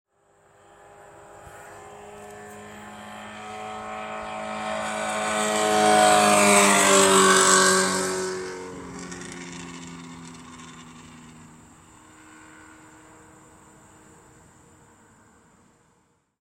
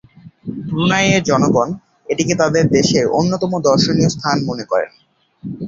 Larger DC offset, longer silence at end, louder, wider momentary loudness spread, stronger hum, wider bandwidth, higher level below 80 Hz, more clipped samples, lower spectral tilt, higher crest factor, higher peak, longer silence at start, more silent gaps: neither; first, 5.15 s vs 0 s; second, -19 LUFS vs -16 LUFS; first, 27 LU vs 15 LU; neither; first, 16.5 kHz vs 7.8 kHz; second, -62 dBFS vs -48 dBFS; neither; second, -2 dB/octave vs -5 dB/octave; first, 22 dB vs 16 dB; second, -4 dBFS vs 0 dBFS; first, 1.45 s vs 0.25 s; neither